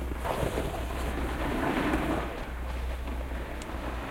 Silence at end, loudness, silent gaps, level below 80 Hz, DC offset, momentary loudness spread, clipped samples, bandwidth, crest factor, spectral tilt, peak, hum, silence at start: 0 s; -33 LUFS; none; -36 dBFS; under 0.1%; 8 LU; under 0.1%; 16.5 kHz; 16 dB; -6 dB/octave; -16 dBFS; none; 0 s